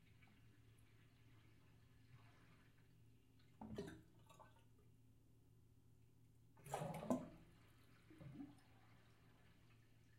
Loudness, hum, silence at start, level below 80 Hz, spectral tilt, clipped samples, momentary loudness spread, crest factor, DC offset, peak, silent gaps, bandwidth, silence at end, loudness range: -52 LUFS; none; 0 s; -78 dBFS; -6.5 dB/octave; under 0.1%; 22 LU; 32 dB; under 0.1%; -26 dBFS; none; 16 kHz; 0 s; 9 LU